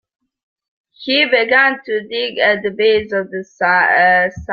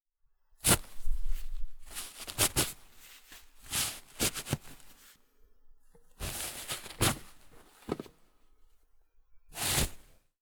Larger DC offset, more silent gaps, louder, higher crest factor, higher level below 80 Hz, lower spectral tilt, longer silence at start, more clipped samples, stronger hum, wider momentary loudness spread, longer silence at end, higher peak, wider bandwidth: neither; neither; first, -14 LUFS vs -33 LUFS; second, 16 dB vs 24 dB; second, -52 dBFS vs -42 dBFS; first, -5 dB/octave vs -2.5 dB/octave; first, 1 s vs 0.65 s; neither; neither; second, 10 LU vs 24 LU; second, 0 s vs 0.4 s; first, 0 dBFS vs -10 dBFS; second, 7 kHz vs over 20 kHz